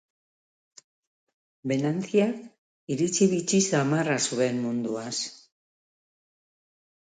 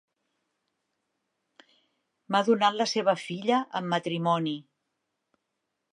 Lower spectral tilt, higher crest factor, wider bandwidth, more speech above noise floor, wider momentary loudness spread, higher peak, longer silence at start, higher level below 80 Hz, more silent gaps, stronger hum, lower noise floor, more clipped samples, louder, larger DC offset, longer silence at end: about the same, -4.5 dB/octave vs -5 dB/octave; about the same, 20 dB vs 22 dB; second, 9.6 kHz vs 11.5 kHz; first, over 65 dB vs 56 dB; first, 10 LU vs 6 LU; about the same, -10 dBFS vs -8 dBFS; second, 1.65 s vs 2.3 s; first, -72 dBFS vs -84 dBFS; first, 2.58-2.87 s vs none; neither; first, under -90 dBFS vs -82 dBFS; neither; about the same, -26 LUFS vs -27 LUFS; neither; first, 1.65 s vs 1.3 s